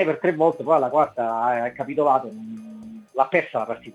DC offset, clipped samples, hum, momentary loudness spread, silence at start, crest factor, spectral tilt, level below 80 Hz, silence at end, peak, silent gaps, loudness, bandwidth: under 0.1%; under 0.1%; none; 17 LU; 0 s; 18 dB; -7.5 dB/octave; -70 dBFS; 0.05 s; -4 dBFS; none; -22 LUFS; 11 kHz